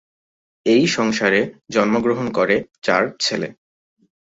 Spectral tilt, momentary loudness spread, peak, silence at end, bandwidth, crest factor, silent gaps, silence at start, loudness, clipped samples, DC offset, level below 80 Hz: -4.5 dB/octave; 6 LU; -2 dBFS; 0.8 s; 8 kHz; 18 dB; 2.78-2.82 s; 0.65 s; -19 LUFS; under 0.1%; under 0.1%; -58 dBFS